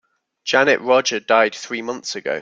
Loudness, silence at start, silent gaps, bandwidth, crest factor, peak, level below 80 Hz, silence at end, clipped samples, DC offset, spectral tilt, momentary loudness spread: -18 LUFS; 0.45 s; none; 7.8 kHz; 18 dB; -2 dBFS; -68 dBFS; 0 s; under 0.1%; under 0.1%; -2.5 dB/octave; 11 LU